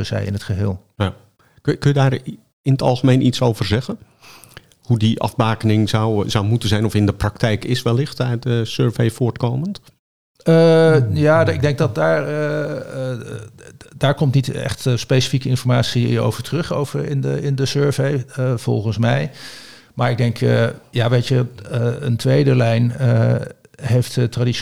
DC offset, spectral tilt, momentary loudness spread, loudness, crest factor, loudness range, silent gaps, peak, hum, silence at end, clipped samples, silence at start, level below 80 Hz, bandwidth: 0.7%; -6.5 dB/octave; 10 LU; -18 LUFS; 16 dB; 4 LU; 2.53-2.64 s, 9.99-10.35 s; -2 dBFS; none; 0 s; under 0.1%; 0 s; -46 dBFS; 13.5 kHz